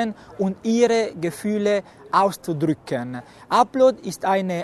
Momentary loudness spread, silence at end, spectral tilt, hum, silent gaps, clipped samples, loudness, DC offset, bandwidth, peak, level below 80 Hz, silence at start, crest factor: 10 LU; 0 s; -5.5 dB/octave; none; none; under 0.1%; -22 LUFS; under 0.1%; 13.5 kHz; -4 dBFS; -62 dBFS; 0 s; 18 dB